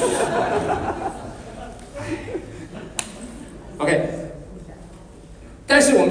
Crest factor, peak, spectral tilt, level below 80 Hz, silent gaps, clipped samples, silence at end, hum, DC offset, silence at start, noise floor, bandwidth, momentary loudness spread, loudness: 22 dB; -2 dBFS; -4 dB/octave; -44 dBFS; none; under 0.1%; 0 s; none; under 0.1%; 0 s; -42 dBFS; 10.5 kHz; 24 LU; -22 LUFS